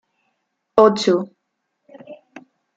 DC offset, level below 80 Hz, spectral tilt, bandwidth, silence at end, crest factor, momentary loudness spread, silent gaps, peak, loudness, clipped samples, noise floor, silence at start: under 0.1%; -62 dBFS; -5.5 dB/octave; 8 kHz; 0.65 s; 20 dB; 21 LU; none; 0 dBFS; -17 LUFS; under 0.1%; -75 dBFS; 0.75 s